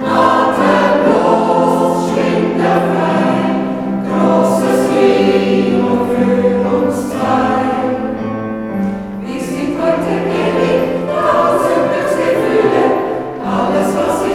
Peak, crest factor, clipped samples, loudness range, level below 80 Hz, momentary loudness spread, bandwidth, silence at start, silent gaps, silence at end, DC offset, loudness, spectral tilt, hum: 0 dBFS; 14 dB; under 0.1%; 4 LU; -46 dBFS; 8 LU; 16 kHz; 0 s; none; 0 s; under 0.1%; -14 LUFS; -6.5 dB/octave; none